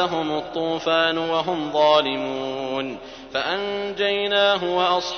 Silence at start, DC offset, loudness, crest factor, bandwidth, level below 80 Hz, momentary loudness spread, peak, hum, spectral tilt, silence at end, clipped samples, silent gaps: 0 s; under 0.1%; -22 LUFS; 18 dB; 6.6 kHz; -56 dBFS; 9 LU; -4 dBFS; none; -4 dB/octave; 0 s; under 0.1%; none